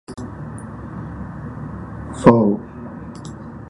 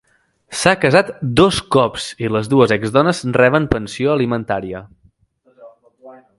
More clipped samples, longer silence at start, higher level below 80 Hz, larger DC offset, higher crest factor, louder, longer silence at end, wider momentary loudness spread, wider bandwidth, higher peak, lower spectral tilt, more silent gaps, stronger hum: neither; second, 0.1 s vs 0.5 s; about the same, -42 dBFS vs -42 dBFS; neither; about the same, 22 dB vs 18 dB; second, -19 LUFS vs -16 LUFS; second, 0 s vs 0.25 s; first, 20 LU vs 10 LU; about the same, 11 kHz vs 12 kHz; about the same, 0 dBFS vs 0 dBFS; first, -8 dB/octave vs -5.5 dB/octave; neither; neither